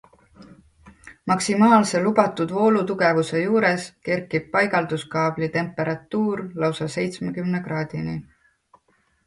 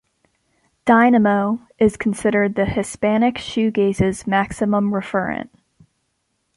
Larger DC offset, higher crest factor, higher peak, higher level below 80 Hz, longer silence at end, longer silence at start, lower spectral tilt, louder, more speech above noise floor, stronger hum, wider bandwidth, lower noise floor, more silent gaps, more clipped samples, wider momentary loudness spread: neither; about the same, 20 dB vs 18 dB; about the same, -2 dBFS vs -2 dBFS; second, -60 dBFS vs -46 dBFS; about the same, 1.05 s vs 1.1 s; second, 0.4 s vs 0.85 s; about the same, -5.5 dB/octave vs -6 dB/octave; second, -22 LUFS vs -18 LUFS; second, 43 dB vs 53 dB; neither; about the same, 11.5 kHz vs 11.5 kHz; second, -65 dBFS vs -71 dBFS; neither; neither; about the same, 10 LU vs 9 LU